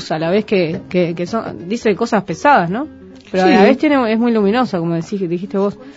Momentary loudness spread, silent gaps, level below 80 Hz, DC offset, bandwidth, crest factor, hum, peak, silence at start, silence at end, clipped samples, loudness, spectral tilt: 10 LU; none; -54 dBFS; under 0.1%; 8 kHz; 16 dB; none; 0 dBFS; 0 s; 0.05 s; under 0.1%; -16 LUFS; -6.5 dB/octave